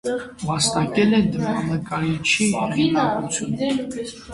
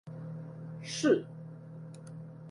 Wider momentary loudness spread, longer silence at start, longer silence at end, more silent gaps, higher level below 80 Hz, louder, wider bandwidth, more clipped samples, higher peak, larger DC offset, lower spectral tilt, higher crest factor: second, 9 LU vs 19 LU; about the same, 0.05 s vs 0.05 s; about the same, 0 s vs 0 s; neither; first, -50 dBFS vs -76 dBFS; first, -21 LUFS vs -33 LUFS; about the same, 11.5 kHz vs 11.5 kHz; neither; first, -4 dBFS vs -14 dBFS; neither; about the same, -4.5 dB/octave vs -5.5 dB/octave; second, 16 dB vs 22 dB